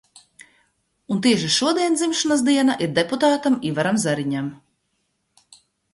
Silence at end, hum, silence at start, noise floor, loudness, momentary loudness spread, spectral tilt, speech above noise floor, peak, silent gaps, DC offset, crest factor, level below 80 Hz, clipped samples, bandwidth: 1.4 s; none; 1.1 s; -72 dBFS; -20 LUFS; 7 LU; -4 dB/octave; 52 dB; -4 dBFS; none; under 0.1%; 18 dB; -64 dBFS; under 0.1%; 11.5 kHz